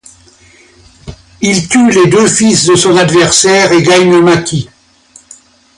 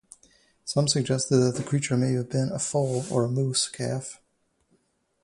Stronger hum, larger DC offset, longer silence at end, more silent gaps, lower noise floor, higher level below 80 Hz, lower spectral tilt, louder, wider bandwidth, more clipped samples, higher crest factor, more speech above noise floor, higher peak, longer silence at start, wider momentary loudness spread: neither; neither; about the same, 1.15 s vs 1.1 s; neither; second, -42 dBFS vs -70 dBFS; first, -42 dBFS vs -62 dBFS; about the same, -4 dB/octave vs -5 dB/octave; first, -7 LUFS vs -26 LUFS; about the same, 11.5 kHz vs 11.5 kHz; neither; second, 10 dB vs 18 dB; second, 35 dB vs 45 dB; first, 0 dBFS vs -8 dBFS; first, 1.05 s vs 0.65 s; about the same, 8 LU vs 8 LU